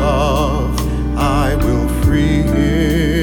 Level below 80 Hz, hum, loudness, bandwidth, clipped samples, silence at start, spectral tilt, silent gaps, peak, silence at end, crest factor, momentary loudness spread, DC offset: -20 dBFS; none; -16 LUFS; 18 kHz; under 0.1%; 0 s; -6.5 dB/octave; none; -4 dBFS; 0 s; 10 dB; 4 LU; under 0.1%